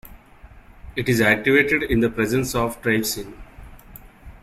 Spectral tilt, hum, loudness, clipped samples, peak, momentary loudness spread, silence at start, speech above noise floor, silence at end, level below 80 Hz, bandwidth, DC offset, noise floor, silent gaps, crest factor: -5 dB/octave; none; -20 LUFS; under 0.1%; -4 dBFS; 12 LU; 0.05 s; 26 dB; 0.1 s; -42 dBFS; 16 kHz; under 0.1%; -46 dBFS; none; 20 dB